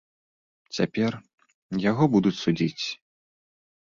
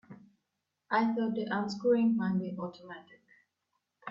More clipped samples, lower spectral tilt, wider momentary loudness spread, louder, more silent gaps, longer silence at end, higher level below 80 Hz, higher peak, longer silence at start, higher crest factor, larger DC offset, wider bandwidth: neither; about the same, -6.5 dB/octave vs -7.5 dB/octave; second, 14 LU vs 21 LU; first, -25 LUFS vs -31 LUFS; first, 1.34-1.38 s, 1.54-1.69 s vs none; first, 1.05 s vs 0 s; first, -62 dBFS vs -76 dBFS; first, -8 dBFS vs -18 dBFS; first, 0.7 s vs 0.1 s; about the same, 20 dB vs 16 dB; neither; about the same, 7.4 kHz vs 7.4 kHz